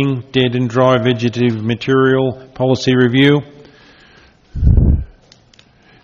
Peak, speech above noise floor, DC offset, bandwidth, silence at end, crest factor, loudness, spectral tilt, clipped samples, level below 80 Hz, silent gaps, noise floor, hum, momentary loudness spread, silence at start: 0 dBFS; 35 dB; under 0.1%; 7.4 kHz; 0.95 s; 14 dB; -14 LUFS; -7 dB/octave; under 0.1%; -24 dBFS; none; -49 dBFS; none; 8 LU; 0 s